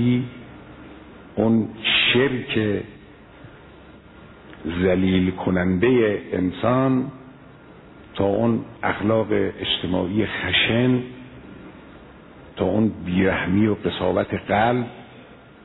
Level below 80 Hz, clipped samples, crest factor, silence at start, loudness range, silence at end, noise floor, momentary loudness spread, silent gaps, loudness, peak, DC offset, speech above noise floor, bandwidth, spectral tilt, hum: -50 dBFS; under 0.1%; 16 dB; 0 s; 3 LU; 0.3 s; -45 dBFS; 23 LU; none; -21 LUFS; -6 dBFS; under 0.1%; 25 dB; 4.1 kHz; -9.5 dB/octave; none